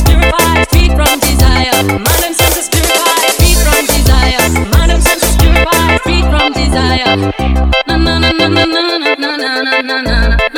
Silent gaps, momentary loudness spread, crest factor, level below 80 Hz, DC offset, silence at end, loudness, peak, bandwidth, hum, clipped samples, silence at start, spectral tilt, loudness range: none; 3 LU; 10 dB; -14 dBFS; under 0.1%; 0 s; -10 LUFS; 0 dBFS; 19 kHz; none; 0.5%; 0 s; -4 dB/octave; 2 LU